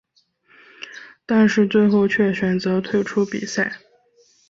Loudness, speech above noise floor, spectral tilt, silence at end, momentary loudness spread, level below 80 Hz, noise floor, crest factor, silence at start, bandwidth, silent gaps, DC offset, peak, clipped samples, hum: -19 LUFS; 42 dB; -6 dB/octave; 0.75 s; 21 LU; -60 dBFS; -60 dBFS; 16 dB; 0.8 s; 7.6 kHz; none; under 0.1%; -6 dBFS; under 0.1%; none